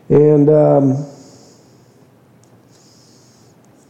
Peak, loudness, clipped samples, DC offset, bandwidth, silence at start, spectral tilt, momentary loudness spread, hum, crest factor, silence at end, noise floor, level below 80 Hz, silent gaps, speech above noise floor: -2 dBFS; -12 LUFS; under 0.1%; under 0.1%; 8 kHz; 0.1 s; -10 dB/octave; 13 LU; none; 16 dB; 2.8 s; -49 dBFS; -54 dBFS; none; 38 dB